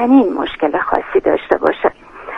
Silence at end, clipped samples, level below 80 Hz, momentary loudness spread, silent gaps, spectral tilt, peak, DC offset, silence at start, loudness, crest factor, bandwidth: 0 s; under 0.1%; -46 dBFS; 7 LU; none; -7 dB/octave; 0 dBFS; under 0.1%; 0 s; -16 LUFS; 16 dB; 5.2 kHz